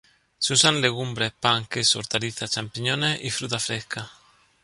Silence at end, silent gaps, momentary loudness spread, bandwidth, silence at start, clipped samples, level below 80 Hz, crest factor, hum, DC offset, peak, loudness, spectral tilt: 0.5 s; none; 10 LU; 11.5 kHz; 0.4 s; under 0.1%; -60 dBFS; 22 dB; none; under 0.1%; -4 dBFS; -23 LUFS; -2.5 dB/octave